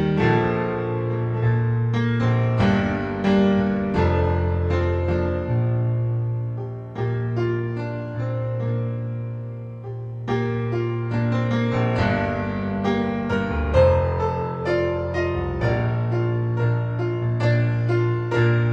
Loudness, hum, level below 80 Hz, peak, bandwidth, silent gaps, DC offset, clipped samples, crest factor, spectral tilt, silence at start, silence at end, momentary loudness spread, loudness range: -23 LUFS; none; -38 dBFS; -6 dBFS; 6.6 kHz; none; under 0.1%; under 0.1%; 16 dB; -9 dB/octave; 0 s; 0 s; 8 LU; 6 LU